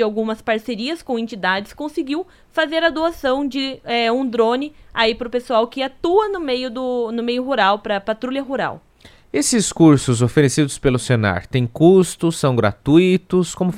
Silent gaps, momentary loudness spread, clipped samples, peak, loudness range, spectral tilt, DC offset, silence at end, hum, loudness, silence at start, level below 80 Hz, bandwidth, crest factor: none; 11 LU; under 0.1%; 0 dBFS; 5 LU; -5 dB/octave; under 0.1%; 0 s; none; -18 LUFS; 0 s; -46 dBFS; 15.5 kHz; 18 dB